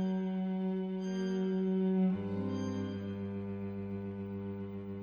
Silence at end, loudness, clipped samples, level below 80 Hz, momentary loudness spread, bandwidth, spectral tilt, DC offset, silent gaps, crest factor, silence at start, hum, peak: 0 s; -36 LUFS; under 0.1%; -68 dBFS; 9 LU; 6.8 kHz; -8.5 dB/octave; under 0.1%; none; 12 dB; 0 s; none; -24 dBFS